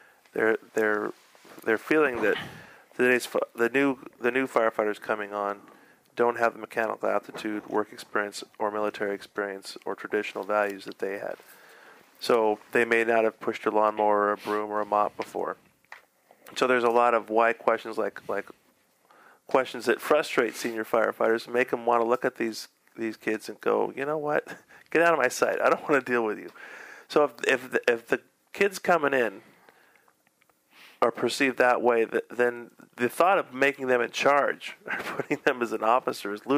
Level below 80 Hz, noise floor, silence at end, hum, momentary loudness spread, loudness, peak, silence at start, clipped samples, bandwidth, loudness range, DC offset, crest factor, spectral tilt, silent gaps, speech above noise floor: -78 dBFS; -67 dBFS; 0 s; none; 12 LU; -26 LUFS; -6 dBFS; 0.35 s; under 0.1%; 15.5 kHz; 5 LU; under 0.1%; 22 dB; -4 dB/octave; none; 40 dB